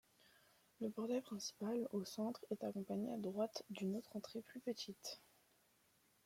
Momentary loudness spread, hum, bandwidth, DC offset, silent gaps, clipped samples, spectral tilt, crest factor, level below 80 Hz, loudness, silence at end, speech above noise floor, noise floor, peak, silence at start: 7 LU; none; 16.5 kHz; under 0.1%; none; under 0.1%; -5 dB/octave; 16 dB; -88 dBFS; -46 LUFS; 1.05 s; 31 dB; -76 dBFS; -30 dBFS; 0.8 s